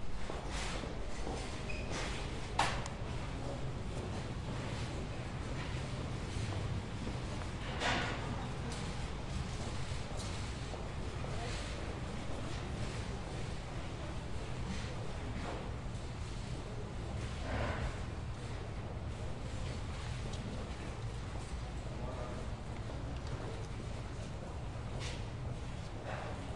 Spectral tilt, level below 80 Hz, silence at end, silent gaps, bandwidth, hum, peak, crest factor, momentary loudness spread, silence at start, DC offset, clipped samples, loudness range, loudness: -5 dB/octave; -46 dBFS; 0 s; none; 11.5 kHz; none; -16 dBFS; 24 dB; 5 LU; 0 s; 0.2%; under 0.1%; 4 LU; -42 LUFS